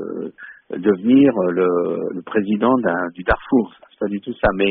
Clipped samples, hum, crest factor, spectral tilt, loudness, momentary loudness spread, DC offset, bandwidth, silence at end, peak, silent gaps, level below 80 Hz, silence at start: under 0.1%; none; 16 dB; -5.5 dB/octave; -19 LUFS; 15 LU; under 0.1%; 4.2 kHz; 0 s; -2 dBFS; none; -40 dBFS; 0 s